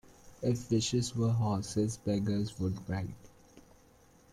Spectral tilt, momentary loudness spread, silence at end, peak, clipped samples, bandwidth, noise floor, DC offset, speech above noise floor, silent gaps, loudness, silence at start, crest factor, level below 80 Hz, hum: -6 dB/octave; 8 LU; 0.75 s; -18 dBFS; under 0.1%; 13 kHz; -62 dBFS; under 0.1%; 30 dB; none; -33 LUFS; 0.25 s; 16 dB; -58 dBFS; none